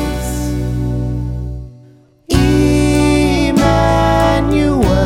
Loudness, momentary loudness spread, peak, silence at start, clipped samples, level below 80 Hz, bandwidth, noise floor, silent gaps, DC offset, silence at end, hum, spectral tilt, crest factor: -14 LUFS; 9 LU; 0 dBFS; 0 s; under 0.1%; -22 dBFS; 16.5 kHz; -44 dBFS; none; under 0.1%; 0 s; none; -6.5 dB/octave; 14 dB